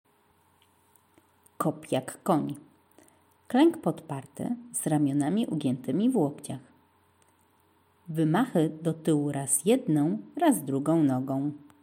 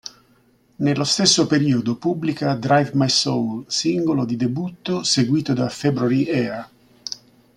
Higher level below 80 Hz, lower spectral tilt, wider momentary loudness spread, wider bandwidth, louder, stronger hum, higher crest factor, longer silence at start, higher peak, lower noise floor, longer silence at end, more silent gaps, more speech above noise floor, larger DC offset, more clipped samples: second, -76 dBFS vs -60 dBFS; first, -6 dB/octave vs -4.5 dB/octave; about the same, 12 LU vs 13 LU; first, 16.5 kHz vs 12 kHz; second, -28 LUFS vs -20 LUFS; neither; about the same, 18 dB vs 18 dB; first, 1.6 s vs 0.05 s; second, -10 dBFS vs -2 dBFS; first, -65 dBFS vs -58 dBFS; second, 0.25 s vs 0.4 s; neither; about the same, 39 dB vs 38 dB; neither; neither